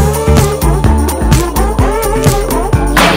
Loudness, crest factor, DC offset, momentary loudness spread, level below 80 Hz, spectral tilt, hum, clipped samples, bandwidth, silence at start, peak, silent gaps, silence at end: -11 LUFS; 10 dB; under 0.1%; 3 LU; -14 dBFS; -5 dB/octave; none; 0.5%; 16.5 kHz; 0 s; 0 dBFS; none; 0 s